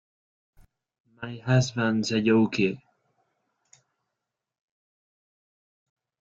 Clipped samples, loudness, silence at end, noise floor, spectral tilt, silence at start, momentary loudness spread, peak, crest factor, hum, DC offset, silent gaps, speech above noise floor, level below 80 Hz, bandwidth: under 0.1%; -24 LUFS; 3.5 s; -85 dBFS; -6 dB/octave; 1.2 s; 18 LU; -10 dBFS; 20 dB; none; under 0.1%; none; 61 dB; -64 dBFS; 7.8 kHz